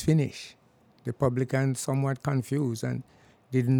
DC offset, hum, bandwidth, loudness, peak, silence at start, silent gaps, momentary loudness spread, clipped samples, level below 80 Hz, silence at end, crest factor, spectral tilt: under 0.1%; none; 17 kHz; -29 LUFS; -10 dBFS; 0 s; none; 12 LU; under 0.1%; -58 dBFS; 0 s; 18 dB; -7 dB/octave